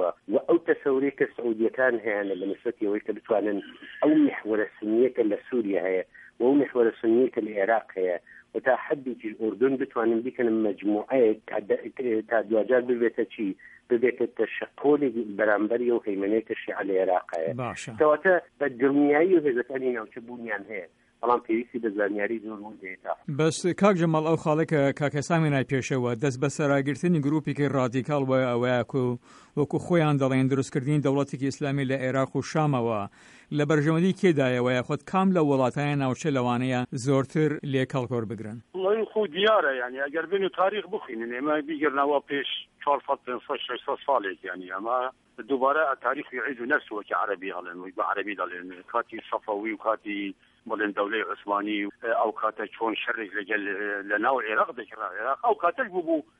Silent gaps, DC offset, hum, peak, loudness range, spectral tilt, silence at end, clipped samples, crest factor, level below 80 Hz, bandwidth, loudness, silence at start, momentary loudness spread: none; under 0.1%; none; -8 dBFS; 4 LU; -6.5 dB/octave; 0.2 s; under 0.1%; 18 dB; -68 dBFS; 11 kHz; -26 LUFS; 0 s; 10 LU